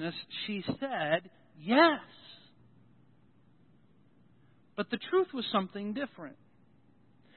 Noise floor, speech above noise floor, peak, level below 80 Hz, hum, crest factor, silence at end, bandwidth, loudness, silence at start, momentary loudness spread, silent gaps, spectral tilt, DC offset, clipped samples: -65 dBFS; 33 dB; -8 dBFS; -76 dBFS; none; 26 dB; 1.05 s; 4.3 kHz; -31 LUFS; 0 s; 24 LU; none; -2.5 dB/octave; under 0.1%; under 0.1%